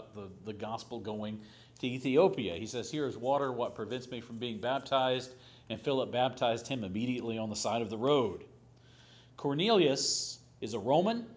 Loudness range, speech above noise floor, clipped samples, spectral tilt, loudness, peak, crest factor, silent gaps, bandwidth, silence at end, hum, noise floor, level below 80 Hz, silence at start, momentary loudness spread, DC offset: 3 LU; 26 dB; under 0.1%; -4.5 dB/octave; -33 LUFS; -14 dBFS; 20 dB; none; 8 kHz; 0 s; none; -59 dBFS; -66 dBFS; 0 s; 15 LU; under 0.1%